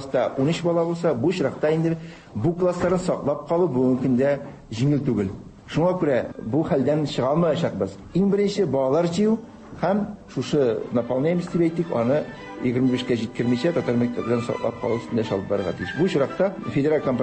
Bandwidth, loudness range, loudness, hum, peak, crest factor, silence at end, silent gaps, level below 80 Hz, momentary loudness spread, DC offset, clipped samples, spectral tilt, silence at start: 8.8 kHz; 2 LU; -23 LUFS; none; -8 dBFS; 14 dB; 0 s; none; -52 dBFS; 6 LU; under 0.1%; under 0.1%; -7.5 dB/octave; 0 s